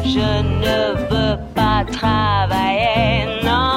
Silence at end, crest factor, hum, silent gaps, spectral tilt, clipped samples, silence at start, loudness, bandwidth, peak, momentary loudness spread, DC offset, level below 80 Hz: 0 s; 12 dB; none; none; -6 dB/octave; under 0.1%; 0 s; -17 LUFS; 16.5 kHz; -4 dBFS; 3 LU; under 0.1%; -28 dBFS